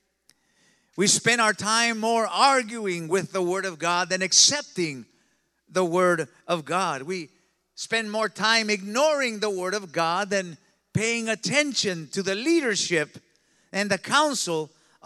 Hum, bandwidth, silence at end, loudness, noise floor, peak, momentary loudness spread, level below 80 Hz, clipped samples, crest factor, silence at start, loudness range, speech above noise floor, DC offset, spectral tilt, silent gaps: none; 14.5 kHz; 0.4 s; -23 LUFS; -69 dBFS; -6 dBFS; 11 LU; -74 dBFS; under 0.1%; 20 dB; 0.95 s; 4 LU; 44 dB; under 0.1%; -2.5 dB/octave; none